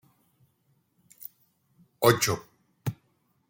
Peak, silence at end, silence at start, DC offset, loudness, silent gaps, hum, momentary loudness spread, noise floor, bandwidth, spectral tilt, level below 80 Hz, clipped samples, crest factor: -6 dBFS; 0.55 s; 2 s; under 0.1%; -27 LUFS; none; none; 23 LU; -71 dBFS; 17 kHz; -4 dB/octave; -66 dBFS; under 0.1%; 26 dB